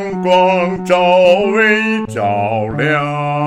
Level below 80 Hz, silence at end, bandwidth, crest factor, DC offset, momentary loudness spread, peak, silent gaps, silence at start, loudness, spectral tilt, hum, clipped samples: -48 dBFS; 0 s; 10.5 kHz; 14 dB; under 0.1%; 7 LU; 0 dBFS; none; 0 s; -13 LUFS; -6 dB/octave; none; under 0.1%